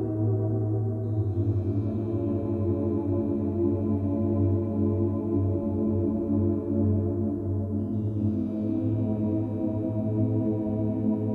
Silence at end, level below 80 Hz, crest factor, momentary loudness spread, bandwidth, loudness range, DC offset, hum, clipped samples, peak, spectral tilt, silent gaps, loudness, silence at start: 0 s; -50 dBFS; 12 dB; 3 LU; 2.7 kHz; 1 LU; under 0.1%; none; under 0.1%; -14 dBFS; -13 dB/octave; none; -27 LUFS; 0 s